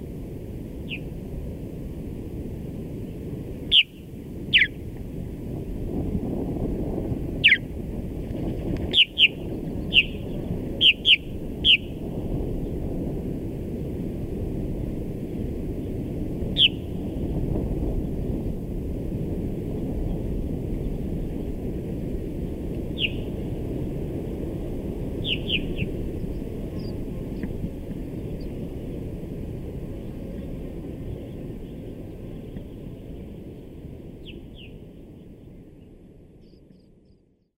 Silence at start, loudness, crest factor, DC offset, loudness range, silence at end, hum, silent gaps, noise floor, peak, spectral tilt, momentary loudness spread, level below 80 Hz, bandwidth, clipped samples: 0 s; -26 LUFS; 24 dB; under 0.1%; 17 LU; 0.8 s; none; none; -59 dBFS; -4 dBFS; -6 dB/octave; 20 LU; -36 dBFS; 16 kHz; under 0.1%